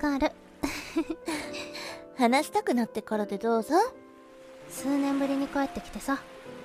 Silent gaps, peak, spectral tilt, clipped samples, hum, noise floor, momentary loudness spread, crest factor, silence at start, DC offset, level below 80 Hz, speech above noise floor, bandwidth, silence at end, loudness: none; -8 dBFS; -4 dB/octave; under 0.1%; none; -50 dBFS; 13 LU; 22 dB; 0 s; under 0.1%; -54 dBFS; 22 dB; 15.5 kHz; 0 s; -29 LUFS